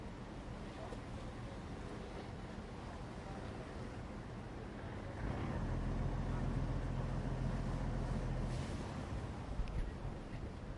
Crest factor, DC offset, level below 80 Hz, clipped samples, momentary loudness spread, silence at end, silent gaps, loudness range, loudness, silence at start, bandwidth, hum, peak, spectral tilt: 14 dB; under 0.1%; -46 dBFS; under 0.1%; 8 LU; 0 s; none; 7 LU; -44 LUFS; 0 s; 11 kHz; none; -28 dBFS; -7 dB/octave